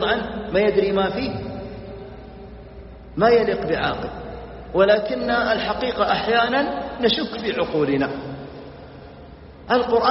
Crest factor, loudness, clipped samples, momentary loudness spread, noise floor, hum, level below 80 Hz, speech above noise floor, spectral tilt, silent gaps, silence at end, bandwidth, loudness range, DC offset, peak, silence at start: 18 dB; -21 LUFS; under 0.1%; 23 LU; -41 dBFS; none; -44 dBFS; 21 dB; -3 dB/octave; none; 0 s; 6 kHz; 4 LU; under 0.1%; -4 dBFS; 0 s